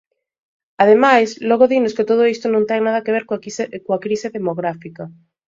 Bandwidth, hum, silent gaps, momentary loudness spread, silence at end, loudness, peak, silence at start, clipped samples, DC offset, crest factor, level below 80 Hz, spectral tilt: 7.6 kHz; none; none; 13 LU; 0.4 s; -17 LUFS; 0 dBFS; 0.8 s; under 0.1%; under 0.1%; 18 dB; -64 dBFS; -5.5 dB/octave